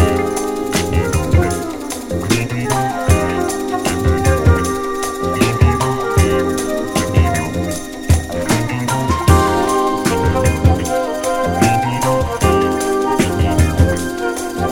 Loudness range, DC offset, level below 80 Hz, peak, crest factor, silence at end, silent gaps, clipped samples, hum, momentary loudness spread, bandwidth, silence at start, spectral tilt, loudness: 2 LU; under 0.1%; -26 dBFS; 0 dBFS; 16 dB; 0 s; none; under 0.1%; none; 6 LU; 17 kHz; 0 s; -5.5 dB/octave; -16 LUFS